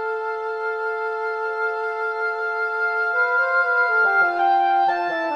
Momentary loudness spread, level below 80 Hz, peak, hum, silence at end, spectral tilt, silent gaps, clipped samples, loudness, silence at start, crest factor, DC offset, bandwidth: 8 LU; -70 dBFS; -8 dBFS; none; 0 s; -3.5 dB/octave; none; under 0.1%; -21 LUFS; 0 s; 14 dB; under 0.1%; 8.2 kHz